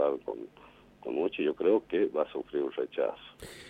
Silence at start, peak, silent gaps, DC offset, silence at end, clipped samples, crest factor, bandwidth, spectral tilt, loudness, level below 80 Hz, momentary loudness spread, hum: 0 s; -14 dBFS; none; under 0.1%; 0 s; under 0.1%; 18 dB; 14.5 kHz; -6 dB/octave; -31 LUFS; -66 dBFS; 17 LU; 50 Hz at -70 dBFS